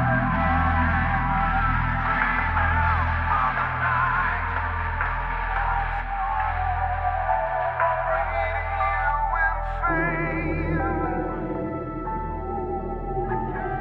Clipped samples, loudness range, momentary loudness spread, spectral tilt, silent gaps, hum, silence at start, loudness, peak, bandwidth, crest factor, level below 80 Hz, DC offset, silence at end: under 0.1%; 4 LU; 7 LU; -9 dB/octave; none; none; 0 s; -24 LUFS; -8 dBFS; 5.2 kHz; 16 dB; -32 dBFS; under 0.1%; 0 s